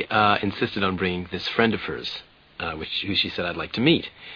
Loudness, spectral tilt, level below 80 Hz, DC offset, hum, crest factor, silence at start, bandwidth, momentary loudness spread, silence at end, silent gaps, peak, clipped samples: -24 LUFS; -6.5 dB/octave; -52 dBFS; under 0.1%; none; 22 dB; 0 s; 5.4 kHz; 11 LU; 0 s; none; -2 dBFS; under 0.1%